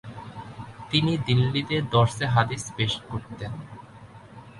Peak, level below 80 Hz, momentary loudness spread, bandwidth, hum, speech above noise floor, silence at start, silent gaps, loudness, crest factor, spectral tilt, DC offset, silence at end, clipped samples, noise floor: -6 dBFS; -52 dBFS; 19 LU; 11.5 kHz; none; 22 dB; 0.05 s; none; -25 LUFS; 20 dB; -5.5 dB/octave; under 0.1%; 0 s; under 0.1%; -46 dBFS